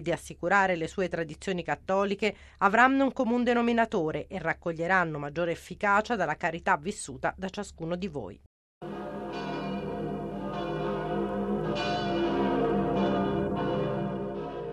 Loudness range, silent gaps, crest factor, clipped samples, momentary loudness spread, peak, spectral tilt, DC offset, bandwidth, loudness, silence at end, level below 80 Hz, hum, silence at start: 9 LU; 8.46-8.81 s; 22 dB; under 0.1%; 11 LU; -6 dBFS; -6 dB/octave; under 0.1%; 12.5 kHz; -29 LUFS; 0 s; -52 dBFS; none; 0 s